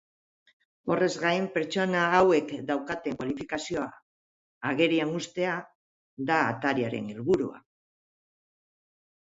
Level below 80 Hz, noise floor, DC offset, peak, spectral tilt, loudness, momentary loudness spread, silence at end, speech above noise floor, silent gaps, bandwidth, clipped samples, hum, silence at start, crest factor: -64 dBFS; under -90 dBFS; under 0.1%; -8 dBFS; -5.5 dB/octave; -28 LUFS; 10 LU; 1.8 s; over 63 dB; 4.02-4.61 s, 5.75-6.17 s; 8 kHz; under 0.1%; none; 0.85 s; 22 dB